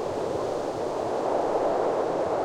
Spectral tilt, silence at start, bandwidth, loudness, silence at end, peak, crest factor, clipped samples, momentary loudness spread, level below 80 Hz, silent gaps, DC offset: -5.5 dB/octave; 0 s; 15.5 kHz; -27 LUFS; 0 s; -12 dBFS; 14 dB; under 0.1%; 4 LU; -58 dBFS; none; under 0.1%